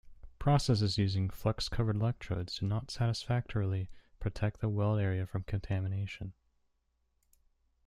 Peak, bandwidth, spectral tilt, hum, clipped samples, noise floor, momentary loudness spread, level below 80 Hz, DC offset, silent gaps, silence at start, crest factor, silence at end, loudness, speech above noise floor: -14 dBFS; 13 kHz; -6.5 dB/octave; none; under 0.1%; -77 dBFS; 9 LU; -50 dBFS; under 0.1%; none; 0.05 s; 20 dB; 1.55 s; -34 LUFS; 45 dB